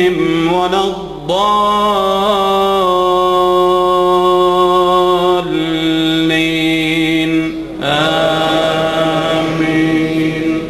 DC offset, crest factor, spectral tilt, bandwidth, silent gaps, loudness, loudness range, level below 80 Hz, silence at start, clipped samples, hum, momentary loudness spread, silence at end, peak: 0.1%; 10 dB; -5.5 dB/octave; 13 kHz; none; -13 LUFS; 2 LU; -40 dBFS; 0 s; under 0.1%; none; 4 LU; 0 s; -2 dBFS